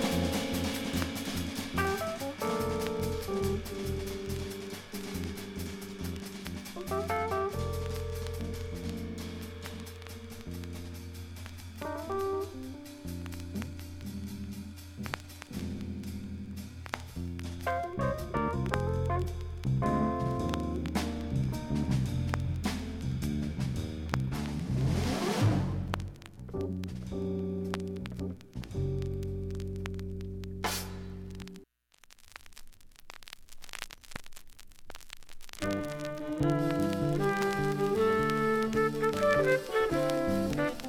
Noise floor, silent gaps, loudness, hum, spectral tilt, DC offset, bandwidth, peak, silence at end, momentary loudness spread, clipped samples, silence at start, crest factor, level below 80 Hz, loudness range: -61 dBFS; none; -34 LUFS; none; -6 dB/octave; under 0.1%; 17.5 kHz; -8 dBFS; 0 s; 15 LU; under 0.1%; 0 s; 26 dB; -46 dBFS; 12 LU